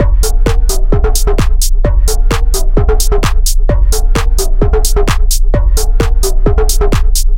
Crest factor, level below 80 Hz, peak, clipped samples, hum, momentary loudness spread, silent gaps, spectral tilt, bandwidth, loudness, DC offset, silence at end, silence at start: 8 dB; -8 dBFS; 0 dBFS; under 0.1%; none; 2 LU; none; -4.5 dB/octave; 17 kHz; -13 LUFS; under 0.1%; 0 s; 0 s